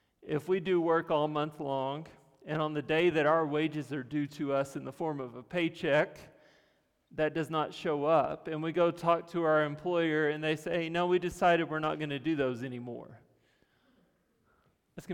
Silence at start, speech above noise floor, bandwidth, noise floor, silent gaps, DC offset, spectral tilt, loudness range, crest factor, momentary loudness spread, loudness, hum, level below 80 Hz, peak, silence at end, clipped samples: 0.25 s; 41 dB; 15 kHz; -72 dBFS; none; under 0.1%; -6.5 dB/octave; 4 LU; 18 dB; 10 LU; -31 LUFS; none; -68 dBFS; -14 dBFS; 0 s; under 0.1%